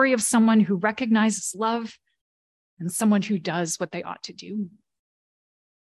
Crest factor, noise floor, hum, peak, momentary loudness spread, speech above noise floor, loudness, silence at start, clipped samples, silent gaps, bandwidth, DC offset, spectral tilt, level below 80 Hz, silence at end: 18 dB; under -90 dBFS; none; -8 dBFS; 16 LU; over 67 dB; -23 LUFS; 0 s; under 0.1%; 2.21-2.77 s; 13 kHz; under 0.1%; -4.5 dB/octave; -70 dBFS; 1.3 s